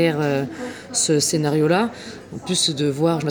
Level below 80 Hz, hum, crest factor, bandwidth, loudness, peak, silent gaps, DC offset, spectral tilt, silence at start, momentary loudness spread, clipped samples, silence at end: -60 dBFS; none; 16 dB; over 20 kHz; -20 LUFS; -4 dBFS; none; under 0.1%; -4 dB/octave; 0 s; 15 LU; under 0.1%; 0 s